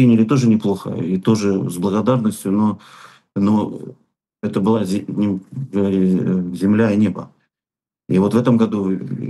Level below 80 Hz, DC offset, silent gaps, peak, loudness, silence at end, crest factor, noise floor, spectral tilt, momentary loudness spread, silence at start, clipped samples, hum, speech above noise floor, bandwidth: -62 dBFS; under 0.1%; none; -2 dBFS; -18 LUFS; 0 s; 14 dB; under -90 dBFS; -7.5 dB/octave; 10 LU; 0 s; under 0.1%; none; over 73 dB; 12.5 kHz